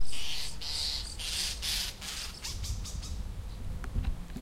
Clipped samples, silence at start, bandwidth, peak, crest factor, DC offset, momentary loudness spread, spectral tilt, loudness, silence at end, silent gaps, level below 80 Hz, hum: under 0.1%; 0 s; 16 kHz; -16 dBFS; 14 dB; under 0.1%; 10 LU; -2 dB/octave; -35 LUFS; 0 s; none; -40 dBFS; none